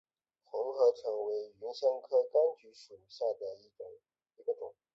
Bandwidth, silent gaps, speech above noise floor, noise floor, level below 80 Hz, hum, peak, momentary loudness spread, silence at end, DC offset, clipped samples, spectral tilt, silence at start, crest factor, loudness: 7.4 kHz; none; 18 dB; -53 dBFS; -86 dBFS; none; -18 dBFS; 21 LU; 0.25 s; under 0.1%; under 0.1%; -4 dB/octave; 0.55 s; 18 dB; -34 LUFS